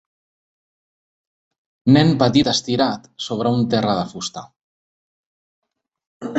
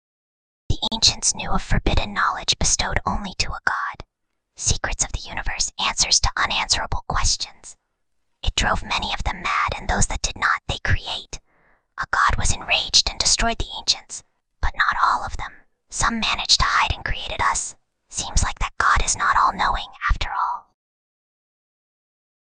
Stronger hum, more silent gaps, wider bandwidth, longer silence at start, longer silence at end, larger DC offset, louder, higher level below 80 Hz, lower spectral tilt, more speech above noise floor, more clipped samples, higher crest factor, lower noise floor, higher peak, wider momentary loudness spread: neither; first, 4.61-5.62 s, 6.06-6.20 s vs none; second, 8.2 kHz vs 10 kHz; first, 1.85 s vs 0.7 s; second, 0 s vs 1.85 s; neither; first, -18 LUFS vs -21 LUFS; second, -54 dBFS vs -30 dBFS; first, -5.5 dB/octave vs -1.5 dB/octave; first, over 72 dB vs 54 dB; neither; about the same, 20 dB vs 22 dB; first, under -90 dBFS vs -76 dBFS; about the same, -2 dBFS vs -2 dBFS; about the same, 14 LU vs 13 LU